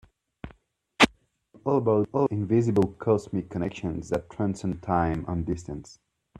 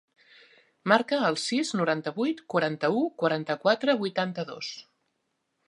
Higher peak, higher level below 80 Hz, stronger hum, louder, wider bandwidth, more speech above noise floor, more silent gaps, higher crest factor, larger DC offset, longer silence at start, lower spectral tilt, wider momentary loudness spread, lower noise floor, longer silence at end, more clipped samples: about the same, -2 dBFS vs -4 dBFS; first, -50 dBFS vs -80 dBFS; neither; about the same, -26 LUFS vs -27 LUFS; first, 13 kHz vs 11.5 kHz; second, 33 dB vs 51 dB; neither; about the same, 26 dB vs 24 dB; neither; second, 0.45 s vs 0.85 s; first, -6 dB/octave vs -4.5 dB/octave; first, 16 LU vs 11 LU; second, -59 dBFS vs -78 dBFS; second, 0.45 s vs 0.85 s; neither